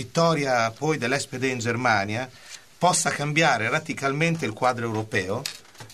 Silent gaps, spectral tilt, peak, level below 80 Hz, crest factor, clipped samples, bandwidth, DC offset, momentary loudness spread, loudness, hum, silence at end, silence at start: none; -4 dB/octave; -6 dBFS; -62 dBFS; 18 dB; under 0.1%; 13.5 kHz; 0.2%; 10 LU; -24 LUFS; none; 0 s; 0 s